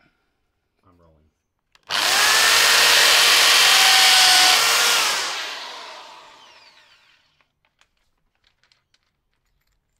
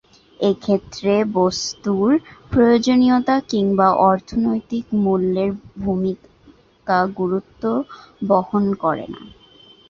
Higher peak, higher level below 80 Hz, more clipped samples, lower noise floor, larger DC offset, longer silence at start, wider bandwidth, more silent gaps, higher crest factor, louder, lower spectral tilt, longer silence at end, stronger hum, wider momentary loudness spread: about the same, -2 dBFS vs -2 dBFS; second, -64 dBFS vs -48 dBFS; neither; first, -72 dBFS vs -51 dBFS; neither; first, 1.9 s vs 0.4 s; first, 16 kHz vs 7.6 kHz; neither; about the same, 18 dB vs 16 dB; first, -13 LUFS vs -19 LUFS; second, 2.5 dB/octave vs -6 dB/octave; first, 3.95 s vs 0.6 s; neither; first, 16 LU vs 10 LU